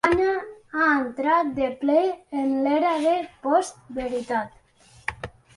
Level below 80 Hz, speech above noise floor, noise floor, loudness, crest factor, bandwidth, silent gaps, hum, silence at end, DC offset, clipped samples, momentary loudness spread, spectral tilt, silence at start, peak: -54 dBFS; 32 dB; -55 dBFS; -24 LUFS; 20 dB; 11.5 kHz; none; none; 0.25 s; under 0.1%; under 0.1%; 12 LU; -5 dB/octave; 0.05 s; -4 dBFS